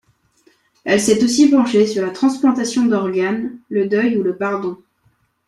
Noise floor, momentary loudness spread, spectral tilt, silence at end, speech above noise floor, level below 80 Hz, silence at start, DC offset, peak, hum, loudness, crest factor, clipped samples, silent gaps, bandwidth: -61 dBFS; 10 LU; -4.5 dB/octave; 0.7 s; 45 dB; -60 dBFS; 0.85 s; under 0.1%; -2 dBFS; none; -16 LUFS; 16 dB; under 0.1%; none; 13 kHz